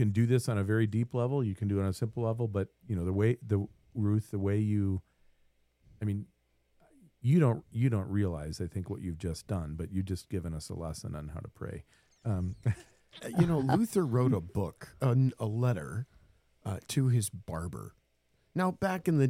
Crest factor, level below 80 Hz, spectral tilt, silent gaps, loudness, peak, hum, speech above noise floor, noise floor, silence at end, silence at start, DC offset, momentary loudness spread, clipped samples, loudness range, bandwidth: 18 dB; -54 dBFS; -7.5 dB/octave; none; -32 LUFS; -12 dBFS; none; 42 dB; -72 dBFS; 0 s; 0 s; under 0.1%; 13 LU; under 0.1%; 7 LU; 15.5 kHz